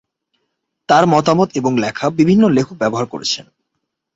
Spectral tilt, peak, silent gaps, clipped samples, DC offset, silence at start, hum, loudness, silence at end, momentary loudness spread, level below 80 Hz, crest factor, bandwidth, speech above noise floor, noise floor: -5.5 dB/octave; -2 dBFS; none; under 0.1%; under 0.1%; 0.9 s; none; -15 LUFS; 0.75 s; 9 LU; -54 dBFS; 16 dB; 8 kHz; 60 dB; -75 dBFS